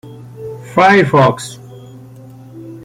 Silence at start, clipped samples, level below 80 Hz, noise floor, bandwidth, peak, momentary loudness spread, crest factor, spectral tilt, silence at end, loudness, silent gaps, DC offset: 0.05 s; under 0.1%; -52 dBFS; -36 dBFS; 15.5 kHz; 0 dBFS; 25 LU; 14 dB; -6 dB/octave; 0.05 s; -11 LUFS; none; under 0.1%